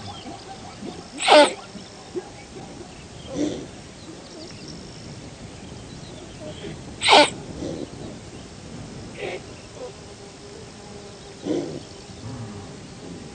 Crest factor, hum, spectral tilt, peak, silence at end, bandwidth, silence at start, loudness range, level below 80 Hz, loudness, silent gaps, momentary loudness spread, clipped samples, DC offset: 26 dB; none; -3 dB/octave; 0 dBFS; 0 s; 9.4 kHz; 0 s; 14 LU; -52 dBFS; -21 LUFS; none; 24 LU; under 0.1%; under 0.1%